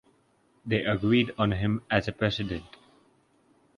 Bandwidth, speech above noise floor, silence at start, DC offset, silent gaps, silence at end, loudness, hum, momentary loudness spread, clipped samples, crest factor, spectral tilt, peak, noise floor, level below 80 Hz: 10 kHz; 39 dB; 0.65 s; under 0.1%; none; 1.1 s; -27 LUFS; none; 10 LU; under 0.1%; 22 dB; -7.5 dB/octave; -8 dBFS; -66 dBFS; -50 dBFS